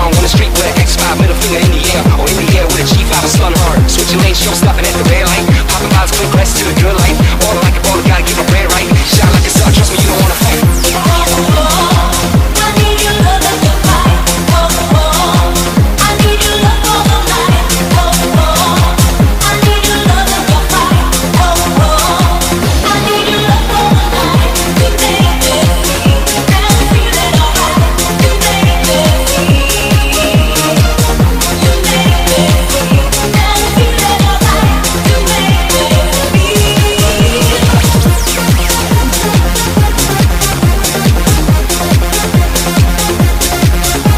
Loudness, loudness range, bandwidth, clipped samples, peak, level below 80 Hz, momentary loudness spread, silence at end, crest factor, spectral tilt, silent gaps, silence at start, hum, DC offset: -9 LUFS; 1 LU; 16.5 kHz; under 0.1%; 0 dBFS; -14 dBFS; 2 LU; 0 s; 8 dB; -4 dB/octave; none; 0 s; none; under 0.1%